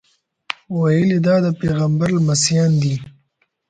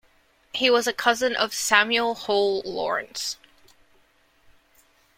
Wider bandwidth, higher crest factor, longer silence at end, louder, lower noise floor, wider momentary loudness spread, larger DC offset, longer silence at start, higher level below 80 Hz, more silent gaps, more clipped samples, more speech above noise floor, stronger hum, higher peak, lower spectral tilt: second, 9.6 kHz vs 16.5 kHz; second, 18 dB vs 24 dB; second, 0.6 s vs 1.85 s; first, -17 LUFS vs -23 LUFS; first, -66 dBFS vs -61 dBFS; about the same, 11 LU vs 11 LU; neither; first, 0.7 s vs 0.55 s; first, -50 dBFS vs -64 dBFS; neither; neither; first, 50 dB vs 38 dB; neither; about the same, 0 dBFS vs -2 dBFS; first, -5.5 dB/octave vs -1 dB/octave